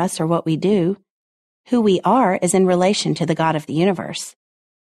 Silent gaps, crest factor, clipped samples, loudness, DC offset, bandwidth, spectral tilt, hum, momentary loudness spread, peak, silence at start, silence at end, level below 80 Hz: 1.10-1.64 s; 14 dB; under 0.1%; -18 LUFS; under 0.1%; 13 kHz; -5.5 dB/octave; none; 10 LU; -4 dBFS; 0 s; 0.6 s; -60 dBFS